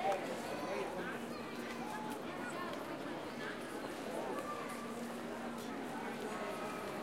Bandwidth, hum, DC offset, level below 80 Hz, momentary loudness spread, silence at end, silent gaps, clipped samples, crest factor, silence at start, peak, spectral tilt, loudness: 16 kHz; none; under 0.1%; -72 dBFS; 3 LU; 0 s; none; under 0.1%; 18 dB; 0 s; -24 dBFS; -4.5 dB/octave; -43 LUFS